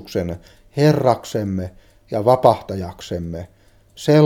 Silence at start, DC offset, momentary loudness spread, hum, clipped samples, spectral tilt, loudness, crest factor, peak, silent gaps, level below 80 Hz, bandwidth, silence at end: 0 s; under 0.1%; 16 LU; none; under 0.1%; -7 dB/octave; -19 LUFS; 20 dB; 0 dBFS; none; -48 dBFS; 16.5 kHz; 0 s